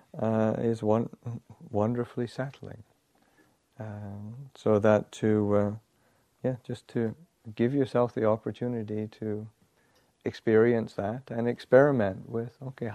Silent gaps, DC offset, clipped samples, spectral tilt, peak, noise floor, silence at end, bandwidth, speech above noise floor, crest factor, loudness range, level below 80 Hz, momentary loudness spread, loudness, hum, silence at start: none; under 0.1%; under 0.1%; -8 dB/octave; -8 dBFS; -68 dBFS; 0 s; 10 kHz; 40 dB; 22 dB; 6 LU; -66 dBFS; 18 LU; -28 LUFS; none; 0.15 s